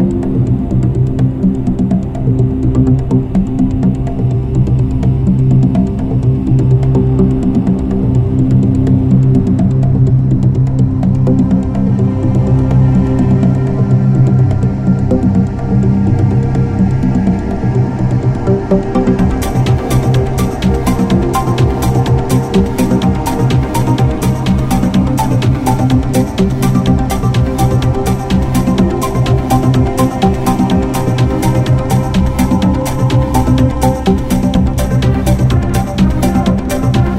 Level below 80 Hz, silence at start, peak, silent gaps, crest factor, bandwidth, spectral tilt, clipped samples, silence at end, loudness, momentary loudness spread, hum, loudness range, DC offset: -22 dBFS; 0 s; 0 dBFS; none; 10 dB; 15 kHz; -7.5 dB/octave; under 0.1%; 0 s; -12 LUFS; 3 LU; none; 2 LU; under 0.1%